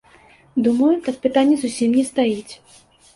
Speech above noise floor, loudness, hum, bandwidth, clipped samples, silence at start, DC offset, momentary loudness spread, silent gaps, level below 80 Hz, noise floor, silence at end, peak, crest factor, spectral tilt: 32 dB; -19 LUFS; none; 11.5 kHz; under 0.1%; 0.55 s; under 0.1%; 9 LU; none; -60 dBFS; -50 dBFS; 0.6 s; -4 dBFS; 16 dB; -5 dB/octave